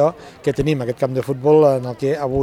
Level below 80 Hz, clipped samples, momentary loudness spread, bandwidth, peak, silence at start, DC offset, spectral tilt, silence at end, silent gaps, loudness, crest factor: -42 dBFS; under 0.1%; 9 LU; 14.5 kHz; -2 dBFS; 0 s; under 0.1%; -7.5 dB/octave; 0 s; none; -18 LUFS; 16 dB